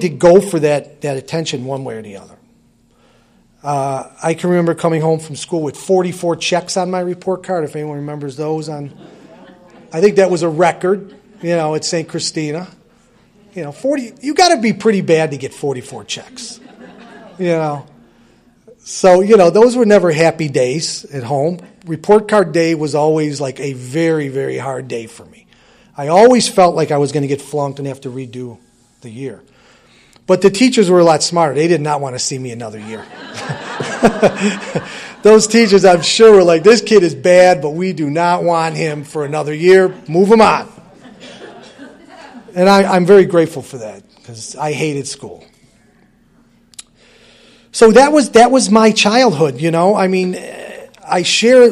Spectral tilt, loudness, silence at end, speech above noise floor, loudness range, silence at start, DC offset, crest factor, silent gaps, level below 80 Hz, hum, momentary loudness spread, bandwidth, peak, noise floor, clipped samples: -5 dB/octave; -13 LUFS; 0 s; 40 dB; 11 LU; 0 s; under 0.1%; 14 dB; none; -52 dBFS; none; 19 LU; 13 kHz; 0 dBFS; -53 dBFS; under 0.1%